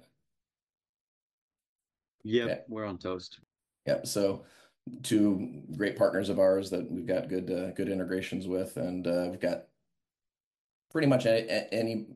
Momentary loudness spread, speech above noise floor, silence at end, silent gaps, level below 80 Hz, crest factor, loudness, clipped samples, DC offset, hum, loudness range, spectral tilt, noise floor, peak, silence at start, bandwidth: 13 LU; over 60 dB; 0 s; 10.40-10.82 s; -70 dBFS; 18 dB; -31 LUFS; under 0.1%; under 0.1%; none; 8 LU; -5.5 dB/octave; under -90 dBFS; -14 dBFS; 2.25 s; 12.5 kHz